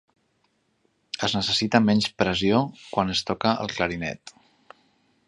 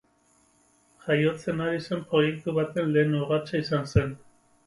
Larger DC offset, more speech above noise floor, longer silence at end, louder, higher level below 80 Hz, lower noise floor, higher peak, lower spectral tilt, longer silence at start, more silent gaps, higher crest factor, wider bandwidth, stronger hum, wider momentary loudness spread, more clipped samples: neither; first, 46 dB vs 39 dB; first, 0.95 s vs 0.5 s; about the same, -24 LUFS vs -26 LUFS; about the same, -52 dBFS vs -48 dBFS; first, -69 dBFS vs -64 dBFS; first, -2 dBFS vs -8 dBFS; second, -5 dB/octave vs -7 dB/octave; about the same, 1.15 s vs 1.05 s; neither; about the same, 24 dB vs 20 dB; about the same, 11 kHz vs 11.5 kHz; neither; first, 10 LU vs 6 LU; neither